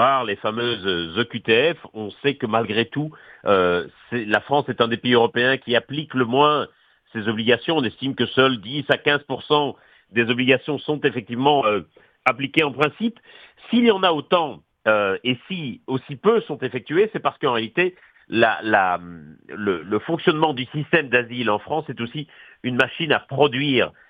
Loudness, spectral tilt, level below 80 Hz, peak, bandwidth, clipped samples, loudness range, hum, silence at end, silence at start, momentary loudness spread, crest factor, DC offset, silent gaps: -21 LUFS; -7 dB/octave; -62 dBFS; 0 dBFS; 8.2 kHz; under 0.1%; 2 LU; none; 0.2 s; 0 s; 10 LU; 20 dB; under 0.1%; none